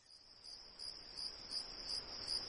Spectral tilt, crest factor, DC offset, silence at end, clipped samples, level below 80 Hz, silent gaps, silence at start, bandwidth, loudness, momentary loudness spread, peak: -0.5 dB/octave; 18 dB; under 0.1%; 0 s; under 0.1%; -68 dBFS; none; 0 s; 10 kHz; -45 LUFS; 11 LU; -30 dBFS